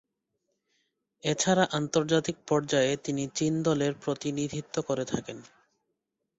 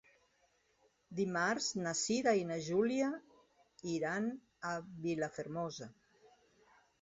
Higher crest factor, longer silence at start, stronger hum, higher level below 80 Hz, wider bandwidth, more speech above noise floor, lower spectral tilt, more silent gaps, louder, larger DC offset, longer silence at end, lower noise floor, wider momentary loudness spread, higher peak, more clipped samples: about the same, 20 dB vs 18 dB; first, 1.25 s vs 1.1 s; neither; first, -64 dBFS vs -76 dBFS; about the same, 8.2 kHz vs 7.6 kHz; first, 54 dB vs 38 dB; about the same, -4.5 dB/octave vs -4 dB/octave; neither; first, -28 LUFS vs -37 LUFS; neither; first, 0.95 s vs 0.75 s; first, -82 dBFS vs -75 dBFS; second, 9 LU vs 12 LU; first, -8 dBFS vs -20 dBFS; neither